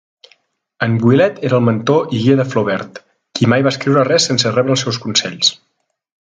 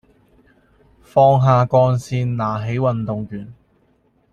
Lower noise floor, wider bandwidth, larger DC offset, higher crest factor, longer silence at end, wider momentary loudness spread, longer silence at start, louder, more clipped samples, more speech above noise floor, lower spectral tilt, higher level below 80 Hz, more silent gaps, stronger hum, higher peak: second, -56 dBFS vs -60 dBFS; about the same, 9.6 kHz vs 9.4 kHz; neither; about the same, 16 dB vs 18 dB; about the same, 0.75 s vs 0.8 s; second, 6 LU vs 13 LU; second, 0.8 s vs 1.15 s; first, -14 LUFS vs -17 LUFS; neither; about the same, 42 dB vs 43 dB; second, -4.5 dB/octave vs -8.5 dB/octave; about the same, -56 dBFS vs -52 dBFS; neither; neither; about the same, 0 dBFS vs -2 dBFS